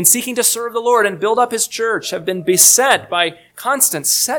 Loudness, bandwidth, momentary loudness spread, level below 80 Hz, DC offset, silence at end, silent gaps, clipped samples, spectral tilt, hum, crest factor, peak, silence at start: -14 LUFS; over 20 kHz; 12 LU; -64 dBFS; under 0.1%; 0 s; none; under 0.1%; -1 dB/octave; none; 16 dB; 0 dBFS; 0 s